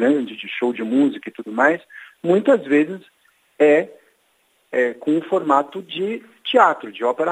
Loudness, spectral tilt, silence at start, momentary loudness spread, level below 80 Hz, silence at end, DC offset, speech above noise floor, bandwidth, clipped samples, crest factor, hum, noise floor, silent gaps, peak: -19 LUFS; -6 dB/octave; 0 s; 12 LU; -80 dBFS; 0 s; under 0.1%; 44 dB; 9.4 kHz; under 0.1%; 20 dB; none; -63 dBFS; none; 0 dBFS